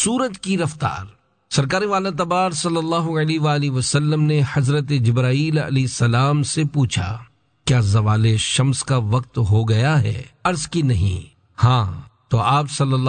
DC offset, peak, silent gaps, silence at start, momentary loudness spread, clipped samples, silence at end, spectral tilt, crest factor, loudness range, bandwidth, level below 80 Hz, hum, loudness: under 0.1%; -4 dBFS; none; 0 s; 6 LU; under 0.1%; 0 s; -5.5 dB/octave; 14 dB; 2 LU; 9.4 kHz; -46 dBFS; none; -19 LUFS